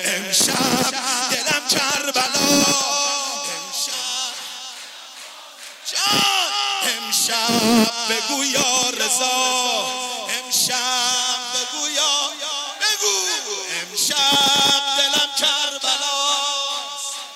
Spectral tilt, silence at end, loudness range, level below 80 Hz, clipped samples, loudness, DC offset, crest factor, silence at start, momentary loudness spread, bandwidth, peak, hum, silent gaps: -0.5 dB/octave; 0 s; 4 LU; -66 dBFS; under 0.1%; -18 LUFS; under 0.1%; 18 dB; 0 s; 10 LU; 16.5 kHz; -2 dBFS; none; none